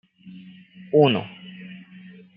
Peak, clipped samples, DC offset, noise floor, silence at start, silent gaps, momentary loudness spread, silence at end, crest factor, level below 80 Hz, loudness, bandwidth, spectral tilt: -4 dBFS; under 0.1%; under 0.1%; -46 dBFS; 0.25 s; none; 26 LU; 0.6 s; 22 dB; -72 dBFS; -20 LUFS; 5.2 kHz; -10.5 dB/octave